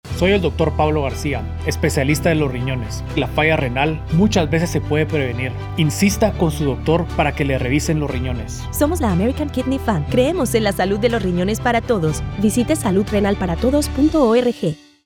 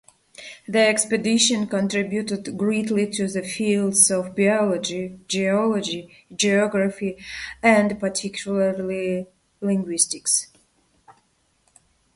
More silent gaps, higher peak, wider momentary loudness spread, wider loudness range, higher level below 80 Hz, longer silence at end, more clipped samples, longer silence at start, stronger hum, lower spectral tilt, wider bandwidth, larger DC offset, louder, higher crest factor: neither; about the same, -4 dBFS vs -4 dBFS; second, 7 LU vs 12 LU; about the same, 2 LU vs 4 LU; first, -32 dBFS vs -60 dBFS; second, 0.3 s vs 1.05 s; neither; second, 0.05 s vs 0.4 s; neither; first, -6 dB/octave vs -3.5 dB/octave; first, over 20 kHz vs 11.5 kHz; neither; first, -18 LUFS vs -21 LUFS; second, 14 dB vs 20 dB